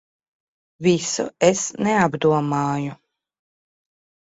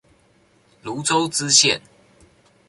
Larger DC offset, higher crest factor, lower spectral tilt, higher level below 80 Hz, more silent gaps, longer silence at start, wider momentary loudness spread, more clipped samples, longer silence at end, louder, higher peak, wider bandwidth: neither; about the same, 20 dB vs 22 dB; first, -4.5 dB/octave vs -1.5 dB/octave; about the same, -60 dBFS vs -62 dBFS; neither; about the same, 0.8 s vs 0.85 s; second, 6 LU vs 17 LU; neither; first, 1.4 s vs 0.9 s; second, -20 LUFS vs -17 LUFS; about the same, -2 dBFS vs 0 dBFS; second, 8.2 kHz vs 11.5 kHz